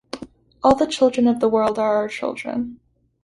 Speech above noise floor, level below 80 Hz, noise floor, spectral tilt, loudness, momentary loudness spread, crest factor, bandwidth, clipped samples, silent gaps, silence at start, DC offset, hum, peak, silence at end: 20 dB; -52 dBFS; -39 dBFS; -5 dB/octave; -20 LUFS; 13 LU; 18 dB; 11.5 kHz; under 0.1%; none; 0.15 s; under 0.1%; none; -2 dBFS; 0.5 s